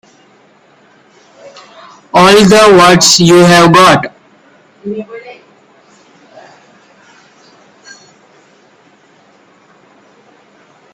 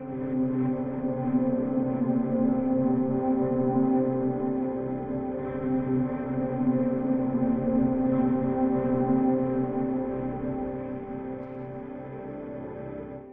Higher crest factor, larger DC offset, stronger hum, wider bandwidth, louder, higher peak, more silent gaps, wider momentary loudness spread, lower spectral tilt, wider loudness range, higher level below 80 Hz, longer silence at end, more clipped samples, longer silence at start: about the same, 12 dB vs 14 dB; neither; neither; first, 20 kHz vs 3.2 kHz; first, -5 LUFS vs -27 LUFS; first, 0 dBFS vs -12 dBFS; neither; first, 21 LU vs 13 LU; second, -4 dB/octave vs -10.5 dB/octave; first, 24 LU vs 5 LU; first, -46 dBFS vs -52 dBFS; first, 5.6 s vs 0 s; first, 0.3% vs under 0.1%; first, 2.15 s vs 0 s